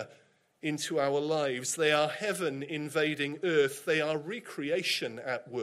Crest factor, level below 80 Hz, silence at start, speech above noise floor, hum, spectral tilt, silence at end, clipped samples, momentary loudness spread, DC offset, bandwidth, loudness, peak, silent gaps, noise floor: 18 dB; -78 dBFS; 0 s; 34 dB; none; -3.5 dB/octave; 0 s; under 0.1%; 9 LU; under 0.1%; 15.5 kHz; -31 LUFS; -14 dBFS; none; -64 dBFS